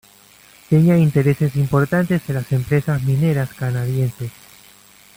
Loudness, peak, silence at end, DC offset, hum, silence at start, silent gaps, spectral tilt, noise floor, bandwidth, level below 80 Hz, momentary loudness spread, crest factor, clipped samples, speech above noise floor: -18 LUFS; -4 dBFS; 0.85 s; under 0.1%; none; 0.7 s; none; -8 dB/octave; -48 dBFS; 16.5 kHz; -48 dBFS; 8 LU; 14 dB; under 0.1%; 31 dB